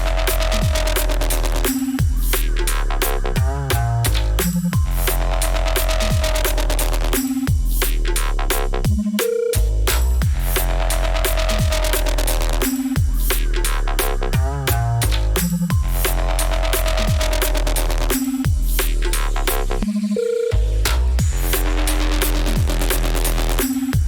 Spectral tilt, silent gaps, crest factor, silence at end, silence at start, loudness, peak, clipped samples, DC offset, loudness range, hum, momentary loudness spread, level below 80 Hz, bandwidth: -4.5 dB/octave; none; 14 dB; 0 s; 0 s; -20 LUFS; -4 dBFS; under 0.1%; under 0.1%; 1 LU; none; 2 LU; -20 dBFS; over 20 kHz